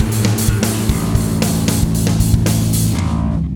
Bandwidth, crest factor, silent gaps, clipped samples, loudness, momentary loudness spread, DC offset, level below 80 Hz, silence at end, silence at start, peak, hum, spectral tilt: 19 kHz; 14 dB; none; under 0.1%; -16 LUFS; 3 LU; under 0.1%; -24 dBFS; 0 s; 0 s; 0 dBFS; none; -5.5 dB/octave